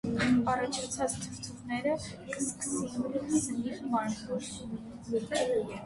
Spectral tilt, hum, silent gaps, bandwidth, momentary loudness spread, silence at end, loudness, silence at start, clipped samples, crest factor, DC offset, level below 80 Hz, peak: -4 dB/octave; none; none; 11.5 kHz; 12 LU; 0 s; -33 LUFS; 0.05 s; under 0.1%; 16 dB; under 0.1%; -58 dBFS; -16 dBFS